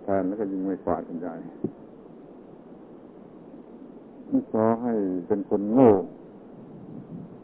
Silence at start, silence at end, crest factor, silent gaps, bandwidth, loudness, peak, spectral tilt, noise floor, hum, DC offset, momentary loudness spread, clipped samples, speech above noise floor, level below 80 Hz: 0 s; 0 s; 24 dB; none; 3.6 kHz; -25 LUFS; -4 dBFS; -12.5 dB/octave; -46 dBFS; none; under 0.1%; 25 LU; under 0.1%; 22 dB; -60 dBFS